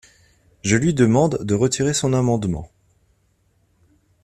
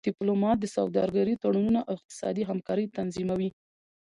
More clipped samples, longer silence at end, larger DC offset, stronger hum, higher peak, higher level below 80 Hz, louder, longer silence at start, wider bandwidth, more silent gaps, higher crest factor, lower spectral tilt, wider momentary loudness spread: neither; first, 1.6 s vs 0.55 s; neither; neither; first, -2 dBFS vs -12 dBFS; first, -48 dBFS vs -60 dBFS; first, -19 LUFS vs -29 LUFS; first, 0.65 s vs 0.05 s; first, 13.5 kHz vs 11 kHz; second, none vs 2.05-2.09 s; about the same, 20 dB vs 16 dB; second, -5.5 dB/octave vs -7 dB/octave; first, 10 LU vs 7 LU